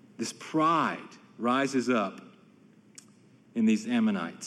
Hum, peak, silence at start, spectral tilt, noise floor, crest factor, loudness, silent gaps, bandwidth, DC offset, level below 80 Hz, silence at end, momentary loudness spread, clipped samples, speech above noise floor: none; -14 dBFS; 0.2 s; -5 dB/octave; -58 dBFS; 16 dB; -28 LUFS; none; 12 kHz; under 0.1%; -86 dBFS; 0 s; 13 LU; under 0.1%; 30 dB